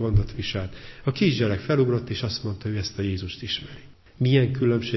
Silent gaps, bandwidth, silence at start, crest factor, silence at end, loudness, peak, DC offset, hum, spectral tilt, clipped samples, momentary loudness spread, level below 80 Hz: none; 6.2 kHz; 0 s; 18 dB; 0 s; -25 LUFS; -6 dBFS; under 0.1%; none; -7 dB/octave; under 0.1%; 10 LU; -40 dBFS